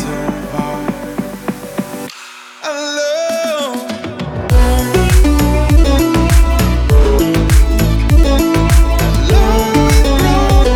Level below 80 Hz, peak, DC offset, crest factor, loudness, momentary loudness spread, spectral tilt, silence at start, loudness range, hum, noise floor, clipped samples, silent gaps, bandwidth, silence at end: -14 dBFS; 0 dBFS; under 0.1%; 12 dB; -13 LUFS; 12 LU; -5.5 dB/octave; 0 s; 8 LU; none; -34 dBFS; under 0.1%; none; 16.5 kHz; 0 s